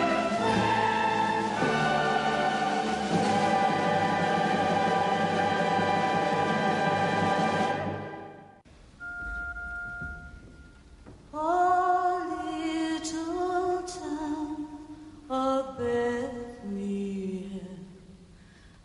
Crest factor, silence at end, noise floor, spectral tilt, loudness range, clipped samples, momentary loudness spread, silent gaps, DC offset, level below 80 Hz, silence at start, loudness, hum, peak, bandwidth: 14 dB; 0.15 s; -53 dBFS; -5 dB/octave; 8 LU; under 0.1%; 14 LU; none; under 0.1%; -54 dBFS; 0 s; -28 LUFS; none; -14 dBFS; 11.5 kHz